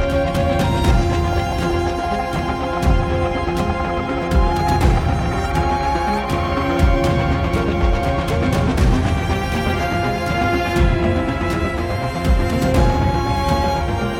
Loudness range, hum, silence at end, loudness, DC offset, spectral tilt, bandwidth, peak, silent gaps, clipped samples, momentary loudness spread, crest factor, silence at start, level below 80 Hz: 1 LU; none; 0 s; -19 LUFS; under 0.1%; -6.5 dB/octave; 16.5 kHz; -4 dBFS; none; under 0.1%; 4 LU; 14 dB; 0 s; -22 dBFS